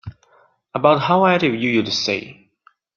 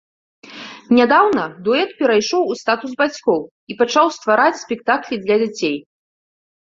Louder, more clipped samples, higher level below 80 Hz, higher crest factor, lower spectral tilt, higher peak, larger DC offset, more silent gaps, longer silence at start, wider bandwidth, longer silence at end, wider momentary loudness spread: about the same, -17 LUFS vs -17 LUFS; neither; first, -58 dBFS vs -64 dBFS; about the same, 18 dB vs 18 dB; about the same, -5 dB/octave vs -4 dB/octave; about the same, -2 dBFS vs 0 dBFS; neither; second, none vs 3.51-3.67 s; second, 0.05 s vs 0.45 s; about the same, 7.2 kHz vs 7.6 kHz; second, 0.65 s vs 0.9 s; about the same, 9 LU vs 9 LU